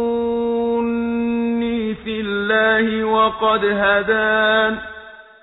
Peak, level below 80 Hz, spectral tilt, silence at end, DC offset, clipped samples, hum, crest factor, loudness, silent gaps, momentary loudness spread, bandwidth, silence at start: -4 dBFS; -48 dBFS; -8 dB/octave; 0.2 s; under 0.1%; under 0.1%; none; 16 dB; -18 LUFS; none; 8 LU; 4.1 kHz; 0 s